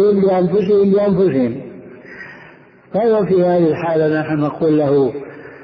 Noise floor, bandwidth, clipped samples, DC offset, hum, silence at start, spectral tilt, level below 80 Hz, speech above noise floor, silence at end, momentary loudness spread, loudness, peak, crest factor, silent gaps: -43 dBFS; 5.4 kHz; under 0.1%; under 0.1%; none; 0 s; -10.5 dB/octave; -52 dBFS; 29 dB; 0 s; 20 LU; -15 LUFS; -4 dBFS; 12 dB; none